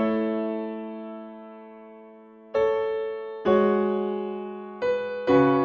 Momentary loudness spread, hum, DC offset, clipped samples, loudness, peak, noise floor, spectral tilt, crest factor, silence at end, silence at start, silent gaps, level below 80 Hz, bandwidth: 22 LU; none; under 0.1%; under 0.1%; -26 LUFS; -8 dBFS; -48 dBFS; -8.5 dB/octave; 18 dB; 0 s; 0 s; none; -60 dBFS; 7 kHz